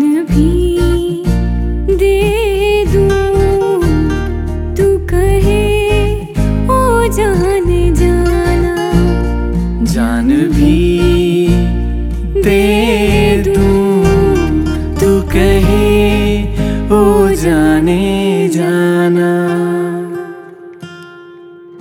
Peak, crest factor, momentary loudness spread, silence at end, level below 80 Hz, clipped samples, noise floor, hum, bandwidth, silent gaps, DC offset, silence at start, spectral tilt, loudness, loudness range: 0 dBFS; 12 dB; 7 LU; 0 s; -18 dBFS; under 0.1%; -34 dBFS; none; 16.5 kHz; none; under 0.1%; 0 s; -6.5 dB/octave; -12 LUFS; 2 LU